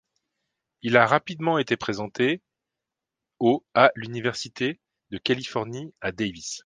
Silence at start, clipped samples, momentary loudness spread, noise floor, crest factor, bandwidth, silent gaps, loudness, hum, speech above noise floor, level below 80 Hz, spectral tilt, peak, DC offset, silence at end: 0.85 s; under 0.1%; 13 LU; -87 dBFS; 24 dB; 9.8 kHz; none; -25 LUFS; none; 63 dB; -62 dBFS; -5 dB/octave; 0 dBFS; under 0.1%; 0.05 s